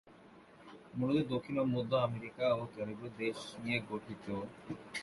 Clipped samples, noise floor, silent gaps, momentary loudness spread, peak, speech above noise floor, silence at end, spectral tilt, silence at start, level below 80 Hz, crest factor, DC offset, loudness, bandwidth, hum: under 0.1%; -59 dBFS; none; 13 LU; -18 dBFS; 22 dB; 0 s; -6.5 dB/octave; 0.05 s; -68 dBFS; 18 dB; under 0.1%; -37 LUFS; 11.5 kHz; none